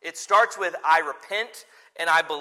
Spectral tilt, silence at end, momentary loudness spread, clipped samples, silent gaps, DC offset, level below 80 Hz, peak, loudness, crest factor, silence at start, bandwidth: -0.5 dB/octave; 0 s; 9 LU; under 0.1%; none; under 0.1%; -86 dBFS; -6 dBFS; -23 LUFS; 18 dB; 0.05 s; 15.5 kHz